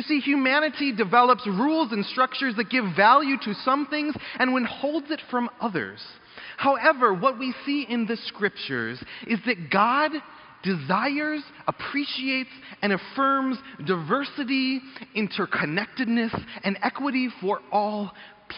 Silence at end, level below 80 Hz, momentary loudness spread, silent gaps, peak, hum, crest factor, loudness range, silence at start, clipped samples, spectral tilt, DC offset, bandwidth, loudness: 0 s; -66 dBFS; 10 LU; none; -4 dBFS; none; 20 dB; 5 LU; 0 s; under 0.1%; -3 dB/octave; under 0.1%; 5.4 kHz; -24 LUFS